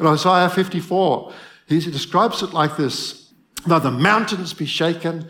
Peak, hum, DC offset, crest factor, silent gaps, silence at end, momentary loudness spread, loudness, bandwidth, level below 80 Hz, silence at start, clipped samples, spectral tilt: 0 dBFS; none; under 0.1%; 20 dB; none; 0 s; 10 LU; -19 LUFS; 17.5 kHz; -62 dBFS; 0 s; under 0.1%; -5 dB/octave